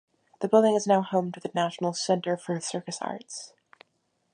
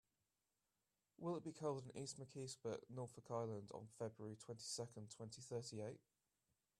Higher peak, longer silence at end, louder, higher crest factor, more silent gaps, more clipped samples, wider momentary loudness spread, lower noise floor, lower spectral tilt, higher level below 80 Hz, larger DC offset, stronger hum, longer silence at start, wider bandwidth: first, -8 dBFS vs -32 dBFS; about the same, 0.85 s vs 0.8 s; first, -27 LUFS vs -51 LUFS; about the same, 20 dB vs 20 dB; neither; neither; first, 15 LU vs 8 LU; second, -74 dBFS vs under -90 dBFS; about the same, -5 dB/octave vs -5 dB/octave; first, -80 dBFS vs -86 dBFS; neither; neither; second, 0.4 s vs 1.2 s; second, 11 kHz vs 13.5 kHz